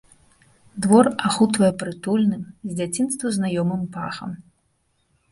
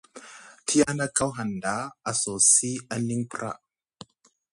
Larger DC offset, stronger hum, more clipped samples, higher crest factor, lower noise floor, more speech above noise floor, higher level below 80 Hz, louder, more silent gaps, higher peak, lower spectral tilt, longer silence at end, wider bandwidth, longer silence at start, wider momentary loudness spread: neither; neither; neither; about the same, 20 dB vs 22 dB; first, -68 dBFS vs -59 dBFS; first, 47 dB vs 33 dB; about the same, -58 dBFS vs -62 dBFS; first, -21 LUFS vs -24 LUFS; neither; first, -2 dBFS vs -6 dBFS; first, -5.5 dB/octave vs -3 dB/octave; about the same, 0.9 s vs 0.95 s; about the same, 11.5 kHz vs 11.5 kHz; first, 0.75 s vs 0.15 s; second, 15 LU vs 18 LU